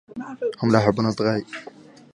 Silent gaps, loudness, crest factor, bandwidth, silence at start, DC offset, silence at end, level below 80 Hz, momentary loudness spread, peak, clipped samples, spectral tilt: none; -22 LUFS; 22 dB; 11 kHz; 0.15 s; under 0.1%; 0.45 s; -56 dBFS; 18 LU; -2 dBFS; under 0.1%; -7 dB/octave